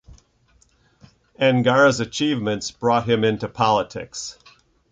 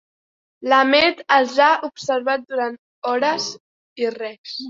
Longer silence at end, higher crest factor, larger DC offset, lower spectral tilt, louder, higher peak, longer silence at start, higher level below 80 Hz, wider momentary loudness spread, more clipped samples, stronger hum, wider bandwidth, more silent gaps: first, 0.6 s vs 0 s; about the same, 18 dB vs 18 dB; neither; first, -5 dB/octave vs -2.5 dB/octave; about the same, -20 LUFS vs -19 LUFS; about the same, -4 dBFS vs -2 dBFS; second, 0.1 s vs 0.6 s; first, -54 dBFS vs -66 dBFS; about the same, 14 LU vs 14 LU; neither; neither; first, 9.2 kHz vs 7.8 kHz; second, none vs 2.79-3.02 s, 3.60-3.96 s, 4.38-4.44 s